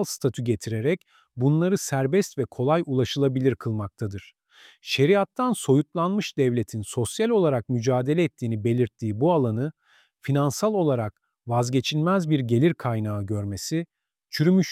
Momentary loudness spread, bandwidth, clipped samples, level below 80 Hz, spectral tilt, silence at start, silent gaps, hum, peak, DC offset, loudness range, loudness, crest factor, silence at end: 9 LU; 15.5 kHz; under 0.1%; -62 dBFS; -6 dB/octave; 0 s; none; none; -8 dBFS; under 0.1%; 2 LU; -24 LUFS; 16 dB; 0 s